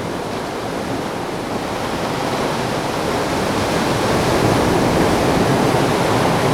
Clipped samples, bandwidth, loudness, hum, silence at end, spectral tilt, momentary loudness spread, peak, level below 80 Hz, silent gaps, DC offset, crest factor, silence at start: under 0.1%; over 20 kHz; -18 LUFS; none; 0 s; -5 dB/octave; 8 LU; -4 dBFS; -38 dBFS; none; under 0.1%; 14 dB; 0 s